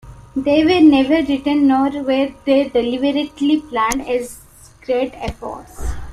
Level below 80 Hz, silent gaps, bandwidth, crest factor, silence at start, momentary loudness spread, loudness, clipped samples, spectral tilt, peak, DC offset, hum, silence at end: -36 dBFS; none; 13.5 kHz; 16 dB; 0.05 s; 18 LU; -16 LUFS; under 0.1%; -5 dB/octave; 0 dBFS; under 0.1%; none; 0 s